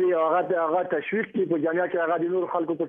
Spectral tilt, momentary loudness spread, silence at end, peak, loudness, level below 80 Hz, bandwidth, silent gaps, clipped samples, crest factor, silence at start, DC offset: -9.5 dB/octave; 4 LU; 0 s; -10 dBFS; -25 LUFS; -74 dBFS; 3.6 kHz; none; under 0.1%; 14 dB; 0 s; under 0.1%